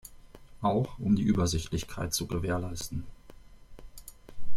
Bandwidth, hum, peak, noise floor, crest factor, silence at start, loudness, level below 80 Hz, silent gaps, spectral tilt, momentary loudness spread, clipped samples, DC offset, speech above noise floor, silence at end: 16 kHz; none; -14 dBFS; -50 dBFS; 14 dB; 0.05 s; -31 LUFS; -46 dBFS; none; -5.5 dB/octave; 23 LU; under 0.1%; under 0.1%; 21 dB; 0 s